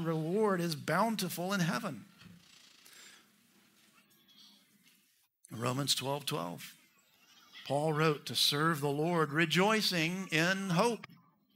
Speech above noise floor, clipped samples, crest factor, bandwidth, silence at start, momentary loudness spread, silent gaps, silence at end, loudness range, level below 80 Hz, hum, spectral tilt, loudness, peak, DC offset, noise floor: 40 dB; under 0.1%; 20 dB; 16 kHz; 0 s; 15 LU; none; 0.4 s; 11 LU; -80 dBFS; none; -4 dB/octave; -32 LUFS; -14 dBFS; under 0.1%; -72 dBFS